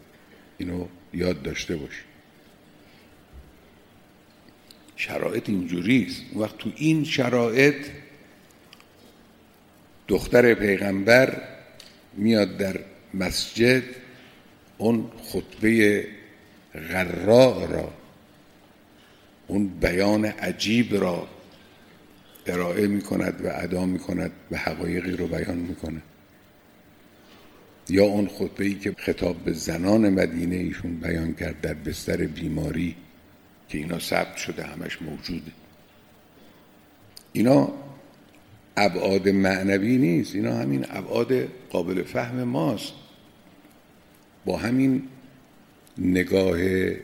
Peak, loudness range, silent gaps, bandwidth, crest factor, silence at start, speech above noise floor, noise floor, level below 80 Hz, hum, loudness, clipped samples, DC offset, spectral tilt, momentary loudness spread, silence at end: -2 dBFS; 9 LU; none; 17 kHz; 24 dB; 0.6 s; 31 dB; -54 dBFS; -50 dBFS; none; -24 LUFS; under 0.1%; under 0.1%; -6 dB/octave; 16 LU; 0 s